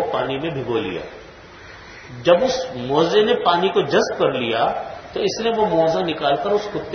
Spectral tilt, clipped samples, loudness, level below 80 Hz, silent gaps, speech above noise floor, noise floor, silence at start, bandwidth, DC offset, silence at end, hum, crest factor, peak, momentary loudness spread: -5 dB/octave; under 0.1%; -20 LUFS; -52 dBFS; none; 22 dB; -41 dBFS; 0 s; 6.6 kHz; under 0.1%; 0 s; none; 18 dB; -2 dBFS; 18 LU